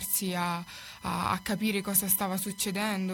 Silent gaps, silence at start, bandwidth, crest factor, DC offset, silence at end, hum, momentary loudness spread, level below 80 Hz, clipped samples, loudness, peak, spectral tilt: none; 0 s; 19.5 kHz; 20 dB; under 0.1%; 0 s; none; 10 LU; -58 dBFS; under 0.1%; -29 LUFS; -10 dBFS; -3.5 dB/octave